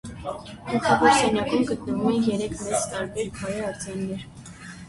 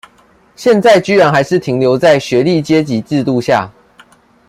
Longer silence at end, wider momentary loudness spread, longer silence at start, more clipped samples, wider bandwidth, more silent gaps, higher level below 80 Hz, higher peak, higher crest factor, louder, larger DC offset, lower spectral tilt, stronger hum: second, 0 s vs 0.8 s; first, 17 LU vs 7 LU; second, 0.05 s vs 0.6 s; neither; second, 11.5 kHz vs 15 kHz; neither; about the same, -50 dBFS vs -52 dBFS; about the same, -4 dBFS vs -2 dBFS; first, 20 dB vs 12 dB; second, -24 LUFS vs -11 LUFS; neither; second, -4.5 dB/octave vs -6 dB/octave; neither